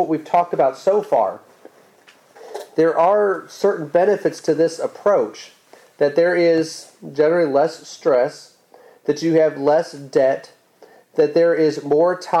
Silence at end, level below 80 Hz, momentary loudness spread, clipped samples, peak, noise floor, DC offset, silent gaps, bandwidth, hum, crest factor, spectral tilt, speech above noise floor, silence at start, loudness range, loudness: 0 s; -68 dBFS; 11 LU; under 0.1%; -6 dBFS; -51 dBFS; under 0.1%; none; 12.5 kHz; none; 14 dB; -5.5 dB/octave; 34 dB; 0 s; 2 LU; -18 LUFS